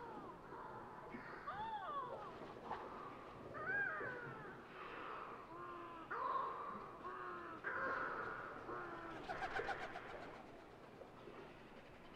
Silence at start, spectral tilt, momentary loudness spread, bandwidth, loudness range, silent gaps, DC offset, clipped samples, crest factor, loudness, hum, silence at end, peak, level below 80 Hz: 0 s; -5.5 dB/octave; 14 LU; 13.5 kHz; 4 LU; none; under 0.1%; under 0.1%; 18 dB; -48 LUFS; none; 0 s; -30 dBFS; -70 dBFS